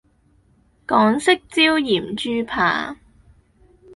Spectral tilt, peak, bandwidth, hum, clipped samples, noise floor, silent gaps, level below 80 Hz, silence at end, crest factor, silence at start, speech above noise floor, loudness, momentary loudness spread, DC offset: -4 dB/octave; -2 dBFS; 11.5 kHz; none; under 0.1%; -58 dBFS; none; -54 dBFS; 1 s; 20 dB; 0.9 s; 39 dB; -18 LUFS; 9 LU; under 0.1%